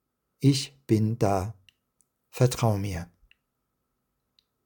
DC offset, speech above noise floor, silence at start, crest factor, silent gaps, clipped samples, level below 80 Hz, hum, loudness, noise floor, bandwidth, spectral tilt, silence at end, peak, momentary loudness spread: under 0.1%; 54 dB; 0.4 s; 20 dB; none; under 0.1%; -58 dBFS; none; -26 LUFS; -79 dBFS; 18 kHz; -6.5 dB/octave; 1.6 s; -8 dBFS; 14 LU